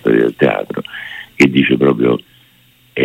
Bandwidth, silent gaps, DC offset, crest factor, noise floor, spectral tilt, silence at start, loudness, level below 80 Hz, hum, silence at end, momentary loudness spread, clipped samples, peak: 16 kHz; none; under 0.1%; 14 dB; -50 dBFS; -6.5 dB/octave; 0.05 s; -14 LUFS; -52 dBFS; none; 0 s; 16 LU; under 0.1%; 0 dBFS